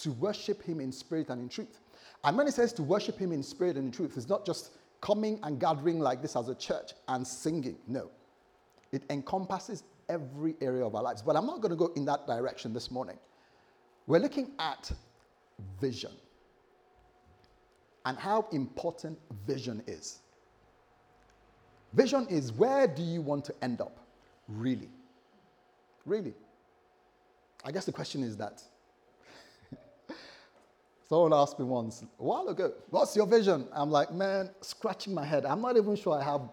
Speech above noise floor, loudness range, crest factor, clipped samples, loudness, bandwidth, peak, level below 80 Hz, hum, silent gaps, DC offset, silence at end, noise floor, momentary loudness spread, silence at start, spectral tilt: 35 dB; 12 LU; 24 dB; under 0.1%; -32 LUFS; 16.5 kHz; -10 dBFS; -64 dBFS; none; none; under 0.1%; 0 s; -67 dBFS; 16 LU; 0 s; -6 dB/octave